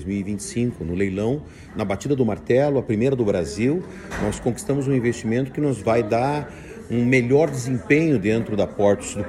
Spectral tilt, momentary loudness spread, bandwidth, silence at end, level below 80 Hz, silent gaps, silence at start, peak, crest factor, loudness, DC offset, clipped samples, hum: -6.5 dB/octave; 8 LU; 14 kHz; 0 s; -46 dBFS; none; 0 s; -4 dBFS; 16 dB; -22 LUFS; under 0.1%; under 0.1%; none